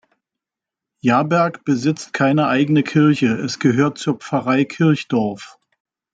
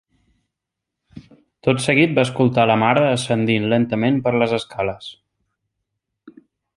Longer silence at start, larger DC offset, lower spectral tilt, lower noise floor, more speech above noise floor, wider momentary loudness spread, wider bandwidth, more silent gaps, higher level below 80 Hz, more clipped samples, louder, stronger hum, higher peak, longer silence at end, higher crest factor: about the same, 1.05 s vs 1.15 s; neither; about the same, -6.5 dB/octave vs -6 dB/octave; first, -86 dBFS vs -82 dBFS; first, 69 dB vs 65 dB; second, 6 LU vs 10 LU; second, 9 kHz vs 11.5 kHz; neither; second, -62 dBFS vs -56 dBFS; neither; about the same, -18 LUFS vs -18 LUFS; neither; about the same, -2 dBFS vs -2 dBFS; first, 0.65 s vs 0.45 s; about the same, 16 dB vs 18 dB